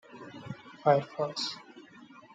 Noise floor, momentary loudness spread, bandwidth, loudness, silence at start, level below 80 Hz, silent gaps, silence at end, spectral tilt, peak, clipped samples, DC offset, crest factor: -53 dBFS; 25 LU; 9.2 kHz; -30 LUFS; 0.1 s; -78 dBFS; none; 0.3 s; -5 dB/octave; -10 dBFS; under 0.1%; under 0.1%; 22 dB